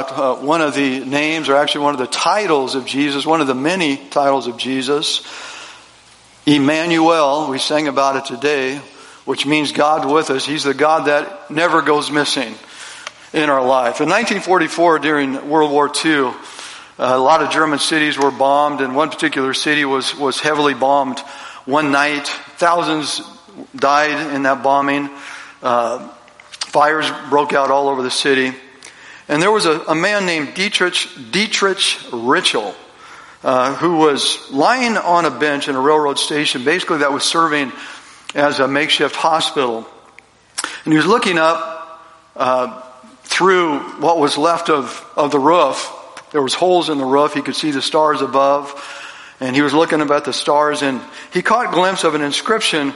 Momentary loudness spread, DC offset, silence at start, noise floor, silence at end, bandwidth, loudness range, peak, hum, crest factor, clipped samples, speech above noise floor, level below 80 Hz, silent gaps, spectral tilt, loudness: 11 LU; under 0.1%; 0 s; -47 dBFS; 0 s; 11.5 kHz; 2 LU; 0 dBFS; none; 16 dB; under 0.1%; 31 dB; -64 dBFS; none; -3.5 dB/octave; -16 LUFS